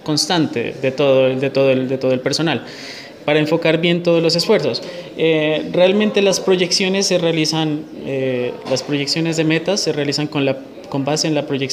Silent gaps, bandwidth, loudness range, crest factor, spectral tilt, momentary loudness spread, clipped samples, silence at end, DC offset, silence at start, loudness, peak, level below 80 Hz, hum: none; 15.5 kHz; 3 LU; 16 dB; -4.5 dB/octave; 8 LU; under 0.1%; 0 s; under 0.1%; 0.05 s; -17 LUFS; -2 dBFS; -60 dBFS; none